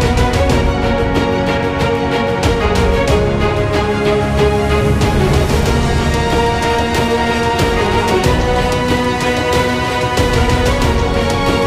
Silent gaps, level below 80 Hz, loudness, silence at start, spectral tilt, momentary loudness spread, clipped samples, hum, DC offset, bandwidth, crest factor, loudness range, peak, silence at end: none; -22 dBFS; -14 LUFS; 0 s; -5.5 dB/octave; 2 LU; under 0.1%; none; 0.1%; 15.5 kHz; 12 dB; 1 LU; 0 dBFS; 0 s